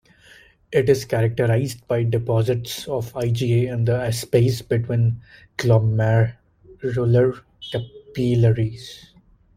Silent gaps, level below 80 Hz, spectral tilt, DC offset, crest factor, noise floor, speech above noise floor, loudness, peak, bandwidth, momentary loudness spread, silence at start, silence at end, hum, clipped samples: none; -50 dBFS; -7 dB/octave; under 0.1%; 18 dB; -51 dBFS; 31 dB; -21 LUFS; -4 dBFS; 15.5 kHz; 12 LU; 0.7 s; 0.6 s; none; under 0.1%